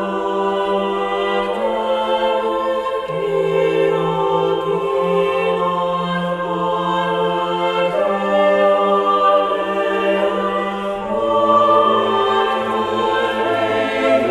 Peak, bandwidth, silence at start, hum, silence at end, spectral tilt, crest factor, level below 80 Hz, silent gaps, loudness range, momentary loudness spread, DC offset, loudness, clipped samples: -2 dBFS; 12.5 kHz; 0 s; none; 0 s; -6 dB/octave; 16 dB; -50 dBFS; none; 2 LU; 6 LU; under 0.1%; -17 LUFS; under 0.1%